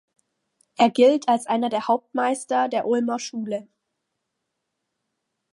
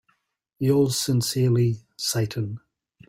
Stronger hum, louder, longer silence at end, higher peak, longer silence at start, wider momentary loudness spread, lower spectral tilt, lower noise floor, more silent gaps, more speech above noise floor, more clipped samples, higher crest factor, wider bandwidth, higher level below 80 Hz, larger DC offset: neither; about the same, -22 LUFS vs -24 LUFS; first, 1.9 s vs 0.5 s; first, -6 dBFS vs -10 dBFS; first, 0.8 s vs 0.6 s; about the same, 12 LU vs 10 LU; second, -4 dB/octave vs -5.5 dB/octave; first, -79 dBFS vs -70 dBFS; neither; first, 58 dB vs 47 dB; neither; about the same, 18 dB vs 16 dB; second, 11.5 kHz vs 16 kHz; second, -80 dBFS vs -58 dBFS; neither